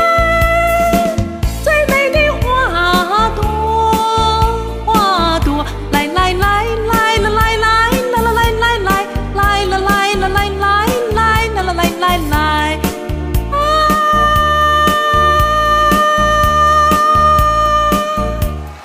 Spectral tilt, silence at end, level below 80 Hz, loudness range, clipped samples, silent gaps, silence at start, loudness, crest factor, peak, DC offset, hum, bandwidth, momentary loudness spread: -4.5 dB/octave; 0 s; -22 dBFS; 3 LU; under 0.1%; none; 0 s; -13 LUFS; 12 dB; 0 dBFS; under 0.1%; none; 16 kHz; 7 LU